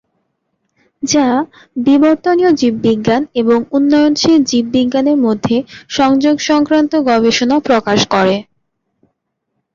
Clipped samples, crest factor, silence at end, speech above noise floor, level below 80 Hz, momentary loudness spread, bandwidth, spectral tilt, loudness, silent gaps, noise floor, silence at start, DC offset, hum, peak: under 0.1%; 12 dB; 1.3 s; 59 dB; -50 dBFS; 5 LU; 7.6 kHz; -4.5 dB/octave; -12 LUFS; none; -71 dBFS; 1 s; under 0.1%; none; -2 dBFS